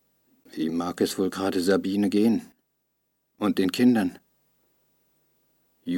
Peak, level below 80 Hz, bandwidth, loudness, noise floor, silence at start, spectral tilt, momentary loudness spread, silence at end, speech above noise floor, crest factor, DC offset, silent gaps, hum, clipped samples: -10 dBFS; -70 dBFS; 17 kHz; -25 LUFS; -75 dBFS; 0.55 s; -5.5 dB/octave; 10 LU; 0 s; 52 dB; 18 dB; under 0.1%; none; none; under 0.1%